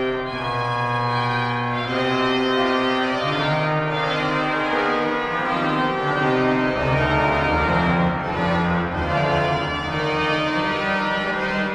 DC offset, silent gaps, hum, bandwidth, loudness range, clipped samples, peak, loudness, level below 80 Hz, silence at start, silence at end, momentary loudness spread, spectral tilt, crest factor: under 0.1%; none; none; 10.5 kHz; 1 LU; under 0.1%; -6 dBFS; -21 LUFS; -42 dBFS; 0 s; 0 s; 4 LU; -6.5 dB/octave; 14 dB